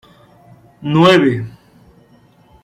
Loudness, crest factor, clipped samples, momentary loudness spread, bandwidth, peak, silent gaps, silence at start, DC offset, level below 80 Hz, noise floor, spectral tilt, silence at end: -13 LUFS; 16 dB; under 0.1%; 19 LU; 12.5 kHz; -2 dBFS; none; 0.8 s; under 0.1%; -54 dBFS; -49 dBFS; -6.5 dB/octave; 1.15 s